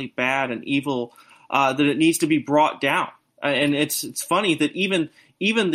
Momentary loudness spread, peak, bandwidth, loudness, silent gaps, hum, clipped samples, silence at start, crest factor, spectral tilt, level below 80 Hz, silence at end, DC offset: 8 LU; -6 dBFS; 15.5 kHz; -21 LUFS; none; none; under 0.1%; 0 s; 16 dB; -4 dB/octave; -66 dBFS; 0 s; under 0.1%